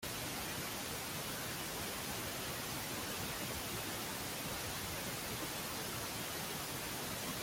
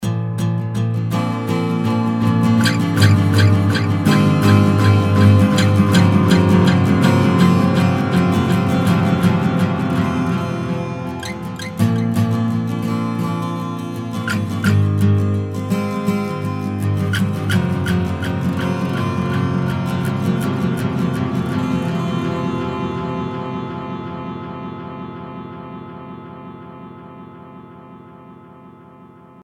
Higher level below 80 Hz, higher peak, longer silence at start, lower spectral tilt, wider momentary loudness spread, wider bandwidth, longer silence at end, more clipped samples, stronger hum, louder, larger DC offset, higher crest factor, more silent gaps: second, -60 dBFS vs -46 dBFS; second, -30 dBFS vs 0 dBFS; about the same, 0 s vs 0 s; second, -2.5 dB/octave vs -7 dB/octave; second, 1 LU vs 16 LU; first, 17 kHz vs 15 kHz; second, 0 s vs 0.35 s; neither; neither; second, -40 LUFS vs -17 LUFS; neither; about the same, 14 dB vs 18 dB; neither